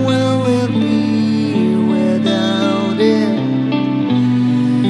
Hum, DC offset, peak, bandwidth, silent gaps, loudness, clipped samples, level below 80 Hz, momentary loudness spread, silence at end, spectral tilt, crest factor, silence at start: none; under 0.1%; -2 dBFS; 11 kHz; none; -15 LUFS; under 0.1%; -60 dBFS; 2 LU; 0 s; -7 dB/octave; 12 dB; 0 s